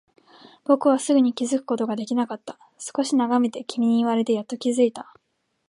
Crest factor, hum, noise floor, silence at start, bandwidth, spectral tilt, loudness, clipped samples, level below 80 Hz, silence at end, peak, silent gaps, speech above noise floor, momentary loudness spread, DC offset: 18 dB; none; -51 dBFS; 0.7 s; 11.5 kHz; -4.5 dB/octave; -23 LUFS; under 0.1%; -76 dBFS; 0.65 s; -4 dBFS; none; 29 dB; 13 LU; under 0.1%